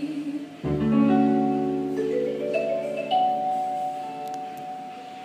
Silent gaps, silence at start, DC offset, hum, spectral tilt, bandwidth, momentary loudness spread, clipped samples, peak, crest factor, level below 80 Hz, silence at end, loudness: none; 0 s; under 0.1%; none; -7.5 dB/octave; 14.5 kHz; 14 LU; under 0.1%; -8 dBFS; 16 dB; -54 dBFS; 0 s; -25 LUFS